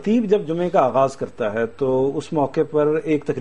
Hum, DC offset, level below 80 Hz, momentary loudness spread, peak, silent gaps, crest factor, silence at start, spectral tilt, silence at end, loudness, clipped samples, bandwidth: none; 0.8%; -56 dBFS; 5 LU; -2 dBFS; none; 18 dB; 0 s; -7.5 dB/octave; 0 s; -20 LUFS; under 0.1%; 10 kHz